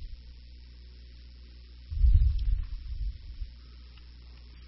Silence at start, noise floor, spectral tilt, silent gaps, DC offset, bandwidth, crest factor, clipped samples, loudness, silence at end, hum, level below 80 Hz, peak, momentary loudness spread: 0 s; -48 dBFS; -7.5 dB/octave; none; under 0.1%; 5.8 kHz; 22 dB; under 0.1%; -31 LUFS; 0 s; 60 Hz at -45 dBFS; -32 dBFS; -10 dBFS; 24 LU